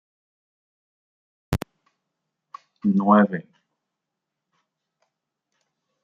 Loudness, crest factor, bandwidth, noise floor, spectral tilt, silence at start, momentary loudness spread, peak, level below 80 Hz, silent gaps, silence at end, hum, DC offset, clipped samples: -21 LUFS; 24 dB; 11.5 kHz; -84 dBFS; -8 dB/octave; 1.5 s; 16 LU; -2 dBFS; -50 dBFS; none; 2.65 s; none; under 0.1%; under 0.1%